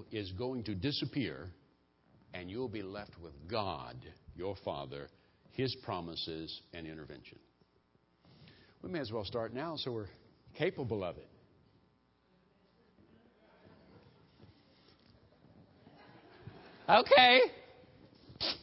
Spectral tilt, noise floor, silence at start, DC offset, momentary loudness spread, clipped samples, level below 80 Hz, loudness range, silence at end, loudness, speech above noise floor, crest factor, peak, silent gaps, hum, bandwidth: -2 dB/octave; -72 dBFS; 0 s; under 0.1%; 25 LU; under 0.1%; -64 dBFS; 15 LU; 0 s; -33 LUFS; 38 dB; 28 dB; -10 dBFS; none; none; 5.6 kHz